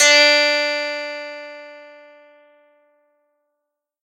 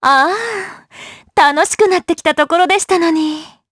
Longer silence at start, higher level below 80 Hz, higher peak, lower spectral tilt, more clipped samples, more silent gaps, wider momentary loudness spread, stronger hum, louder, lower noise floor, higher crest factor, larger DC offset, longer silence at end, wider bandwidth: about the same, 0 s vs 0 s; second, -84 dBFS vs -54 dBFS; about the same, 0 dBFS vs 0 dBFS; second, 2.5 dB/octave vs -2 dB/octave; neither; neither; first, 26 LU vs 17 LU; neither; about the same, -15 LUFS vs -13 LUFS; first, -79 dBFS vs -37 dBFS; first, 20 dB vs 14 dB; neither; first, 2.2 s vs 0.25 s; first, 16 kHz vs 11 kHz